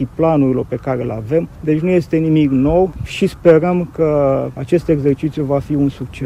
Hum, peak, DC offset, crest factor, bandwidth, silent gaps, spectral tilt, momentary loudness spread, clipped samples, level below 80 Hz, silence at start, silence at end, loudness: none; 0 dBFS; under 0.1%; 16 dB; 13.5 kHz; none; -8.5 dB/octave; 7 LU; under 0.1%; -36 dBFS; 0 s; 0 s; -16 LUFS